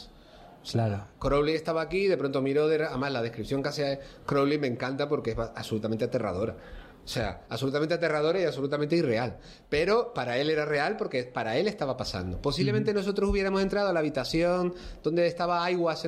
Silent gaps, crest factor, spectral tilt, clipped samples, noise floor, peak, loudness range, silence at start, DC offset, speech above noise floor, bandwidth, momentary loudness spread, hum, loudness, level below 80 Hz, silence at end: none; 14 dB; -6 dB/octave; under 0.1%; -51 dBFS; -14 dBFS; 3 LU; 0 s; under 0.1%; 23 dB; 14 kHz; 7 LU; none; -28 LUFS; -48 dBFS; 0 s